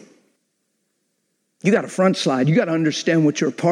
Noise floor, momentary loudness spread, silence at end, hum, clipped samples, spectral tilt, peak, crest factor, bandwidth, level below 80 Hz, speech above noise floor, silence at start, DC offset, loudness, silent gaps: -71 dBFS; 3 LU; 0 s; none; under 0.1%; -6 dB/octave; -4 dBFS; 16 dB; 11 kHz; -72 dBFS; 54 dB; 1.65 s; under 0.1%; -19 LUFS; none